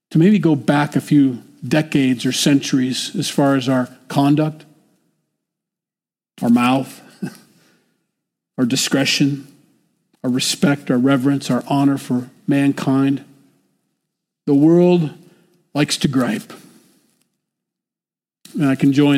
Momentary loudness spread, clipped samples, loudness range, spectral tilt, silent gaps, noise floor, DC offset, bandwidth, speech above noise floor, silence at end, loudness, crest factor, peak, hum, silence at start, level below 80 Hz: 12 LU; under 0.1%; 6 LU; -5.5 dB/octave; none; under -90 dBFS; under 0.1%; 15.5 kHz; over 74 dB; 0 s; -17 LUFS; 14 dB; -4 dBFS; none; 0.1 s; -62 dBFS